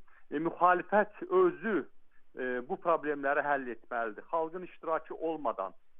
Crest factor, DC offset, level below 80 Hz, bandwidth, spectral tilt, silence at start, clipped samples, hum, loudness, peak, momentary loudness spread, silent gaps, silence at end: 22 dB; under 0.1%; -68 dBFS; 3.8 kHz; -9 dB/octave; 0 s; under 0.1%; none; -32 LUFS; -12 dBFS; 12 LU; none; 0 s